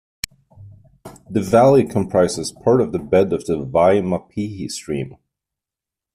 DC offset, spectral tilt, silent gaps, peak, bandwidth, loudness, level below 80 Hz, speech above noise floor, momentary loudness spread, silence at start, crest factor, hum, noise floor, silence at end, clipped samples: under 0.1%; -6 dB/octave; none; -2 dBFS; 15 kHz; -18 LUFS; -50 dBFS; 70 dB; 14 LU; 0.6 s; 16 dB; none; -87 dBFS; 1 s; under 0.1%